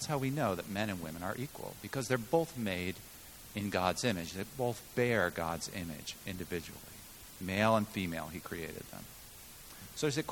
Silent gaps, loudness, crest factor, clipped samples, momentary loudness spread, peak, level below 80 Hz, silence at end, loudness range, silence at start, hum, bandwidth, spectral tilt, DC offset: none; -36 LUFS; 24 dB; under 0.1%; 17 LU; -12 dBFS; -60 dBFS; 0 s; 2 LU; 0 s; none; 19 kHz; -4.5 dB/octave; under 0.1%